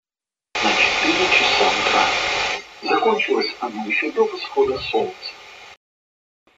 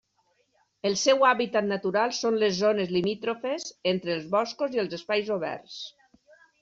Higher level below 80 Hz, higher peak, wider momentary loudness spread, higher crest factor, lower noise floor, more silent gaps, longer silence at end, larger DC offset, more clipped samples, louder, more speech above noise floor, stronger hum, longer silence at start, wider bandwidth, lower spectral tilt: first, -52 dBFS vs -70 dBFS; first, -2 dBFS vs -8 dBFS; first, 13 LU vs 10 LU; about the same, 20 dB vs 18 dB; first, under -90 dBFS vs -71 dBFS; neither; first, 0.85 s vs 0.7 s; neither; neither; first, -19 LUFS vs -26 LUFS; first, over 69 dB vs 44 dB; neither; second, 0.55 s vs 0.85 s; about the same, 8 kHz vs 7.8 kHz; about the same, -2 dB/octave vs -3 dB/octave